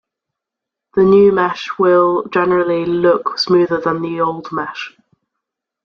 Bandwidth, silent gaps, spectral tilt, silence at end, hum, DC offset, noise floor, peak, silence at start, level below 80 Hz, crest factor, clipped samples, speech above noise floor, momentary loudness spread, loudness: 6.8 kHz; none; -6.5 dB/octave; 0.95 s; none; under 0.1%; -83 dBFS; -2 dBFS; 0.95 s; -54 dBFS; 14 dB; under 0.1%; 69 dB; 12 LU; -15 LUFS